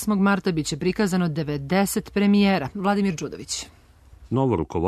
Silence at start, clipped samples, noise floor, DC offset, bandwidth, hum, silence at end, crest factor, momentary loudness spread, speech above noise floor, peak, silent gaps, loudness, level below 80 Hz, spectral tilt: 0 s; under 0.1%; -49 dBFS; under 0.1%; 13.5 kHz; none; 0 s; 16 dB; 11 LU; 27 dB; -6 dBFS; none; -23 LUFS; -48 dBFS; -5.5 dB/octave